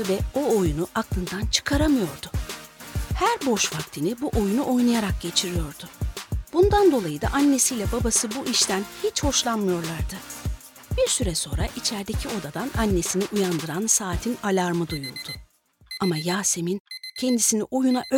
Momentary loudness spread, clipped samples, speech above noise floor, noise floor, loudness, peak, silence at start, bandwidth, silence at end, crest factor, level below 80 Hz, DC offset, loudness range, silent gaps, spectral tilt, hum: 12 LU; under 0.1%; 31 dB; -55 dBFS; -24 LUFS; -4 dBFS; 0 s; 20 kHz; 0 s; 20 dB; -36 dBFS; under 0.1%; 4 LU; 16.80-16.85 s; -4 dB/octave; none